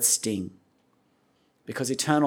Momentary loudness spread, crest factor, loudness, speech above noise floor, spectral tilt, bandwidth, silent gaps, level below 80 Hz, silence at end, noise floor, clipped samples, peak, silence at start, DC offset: 17 LU; 22 dB; -27 LUFS; 42 dB; -3 dB/octave; 19.5 kHz; none; -74 dBFS; 0 s; -67 dBFS; under 0.1%; -6 dBFS; 0 s; under 0.1%